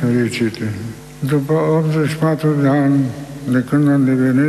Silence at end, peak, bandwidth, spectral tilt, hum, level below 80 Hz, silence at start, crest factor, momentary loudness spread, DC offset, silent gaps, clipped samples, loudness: 0 s; -4 dBFS; 13.5 kHz; -7.5 dB/octave; none; -50 dBFS; 0 s; 12 dB; 11 LU; under 0.1%; none; under 0.1%; -16 LUFS